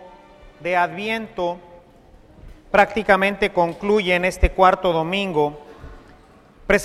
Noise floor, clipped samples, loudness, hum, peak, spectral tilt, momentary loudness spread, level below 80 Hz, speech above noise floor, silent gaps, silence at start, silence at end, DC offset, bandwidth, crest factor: -49 dBFS; under 0.1%; -20 LUFS; none; 0 dBFS; -5 dB/octave; 11 LU; -34 dBFS; 30 dB; none; 0 s; 0 s; under 0.1%; 15 kHz; 22 dB